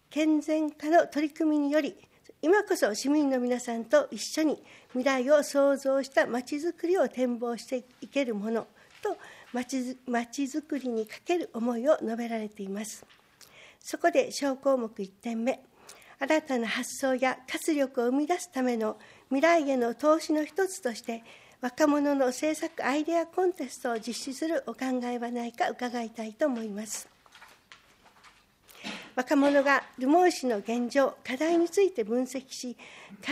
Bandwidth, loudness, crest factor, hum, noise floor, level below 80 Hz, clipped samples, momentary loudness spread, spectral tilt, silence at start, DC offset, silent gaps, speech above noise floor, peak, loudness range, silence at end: 15.5 kHz; -29 LUFS; 18 dB; none; -59 dBFS; -76 dBFS; under 0.1%; 13 LU; -3.5 dB/octave; 0.1 s; under 0.1%; none; 31 dB; -10 dBFS; 6 LU; 0 s